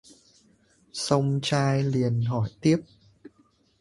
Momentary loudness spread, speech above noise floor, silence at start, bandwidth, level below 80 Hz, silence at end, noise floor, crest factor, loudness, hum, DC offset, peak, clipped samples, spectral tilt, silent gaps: 4 LU; 40 dB; 0.95 s; 11.5 kHz; -58 dBFS; 0.95 s; -64 dBFS; 20 dB; -25 LUFS; none; under 0.1%; -6 dBFS; under 0.1%; -6 dB/octave; none